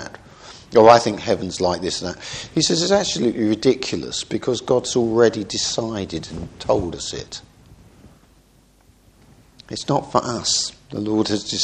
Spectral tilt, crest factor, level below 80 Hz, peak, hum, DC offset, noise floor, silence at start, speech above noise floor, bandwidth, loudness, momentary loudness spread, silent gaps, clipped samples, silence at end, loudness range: -4 dB/octave; 22 dB; -50 dBFS; 0 dBFS; none; under 0.1%; -54 dBFS; 0 s; 35 dB; 10 kHz; -20 LUFS; 14 LU; none; under 0.1%; 0 s; 11 LU